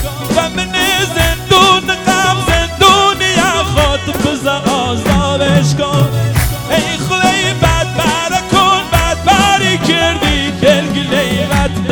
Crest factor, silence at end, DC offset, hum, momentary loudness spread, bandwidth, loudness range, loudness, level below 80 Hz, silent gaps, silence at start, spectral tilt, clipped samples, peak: 12 dB; 0 s; under 0.1%; none; 5 LU; over 20 kHz; 3 LU; -11 LUFS; -26 dBFS; none; 0 s; -4 dB/octave; 0.4%; 0 dBFS